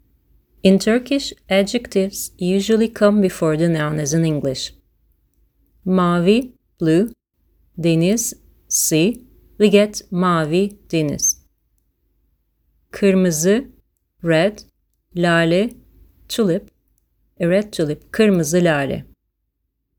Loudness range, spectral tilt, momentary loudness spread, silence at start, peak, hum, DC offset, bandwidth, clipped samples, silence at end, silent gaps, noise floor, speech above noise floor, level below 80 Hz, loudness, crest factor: 3 LU; -5 dB/octave; 10 LU; 0.65 s; 0 dBFS; none; under 0.1%; over 20 kHz; under 0.1%; 0.95 s; none; -73 dBFS; 56 dB; -50 dBFS; -18 LUFS; 18 dB